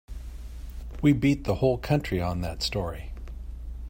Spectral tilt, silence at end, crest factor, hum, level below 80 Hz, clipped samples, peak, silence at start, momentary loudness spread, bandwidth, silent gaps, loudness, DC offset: -6.5 dB/octave; 0 s; 18 dB; none; -38 dBFS; under 0.1%; -10 dBFS; 0.1 s; 18 LU; 16.5 kHz; none; -26 LUFS; under 0.1%